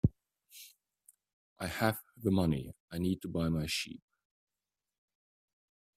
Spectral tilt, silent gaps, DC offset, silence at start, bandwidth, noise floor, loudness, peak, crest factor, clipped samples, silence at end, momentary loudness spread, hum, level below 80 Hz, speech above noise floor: -6 dB/octave; 1.33-1.56 s, 2.80-2.88 s; under 0.1%; 0.05 s; 16 kHz; under -90 dBFS; -35 LUFS; -14 dBFS; 22 dB; under 0.1%; 2 s; 21 LU; none; -56 dBFS; over 56 dB